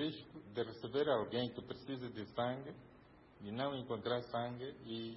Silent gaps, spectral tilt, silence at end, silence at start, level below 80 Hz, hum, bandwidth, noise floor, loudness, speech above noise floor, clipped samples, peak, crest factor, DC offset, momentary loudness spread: none; -4.5 dB/octave; 0 s; 0 s; -72 dBFS; none; 5.6 kHz; -62 dBFS; -42 LUFS; 21 dB; under 0.1%; -24 dBFS; 18 dB; under 0.1%; 14 LU